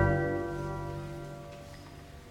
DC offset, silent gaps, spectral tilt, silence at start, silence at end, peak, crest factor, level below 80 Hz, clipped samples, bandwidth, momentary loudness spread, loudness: under 0.1%; none; -7.5 dB/octave; 0 s; 0 s; -14 dBFS; 20 dB; -46 dBFS; under 0.1%; 16 kHz; 18 LU; -35 LUFS